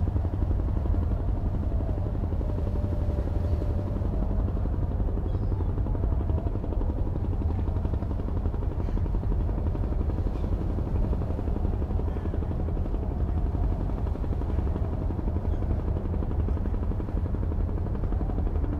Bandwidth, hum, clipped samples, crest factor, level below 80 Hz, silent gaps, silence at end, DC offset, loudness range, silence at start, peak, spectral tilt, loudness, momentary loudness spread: 4.5 kHz; none; under 0.1%; 14 dB; -28 dBFS; none; 0 s; under 0.1%; 1 LU; 0 s; -14 dBFS; -10.5 dB/octave; -30 LUFS; 2 LU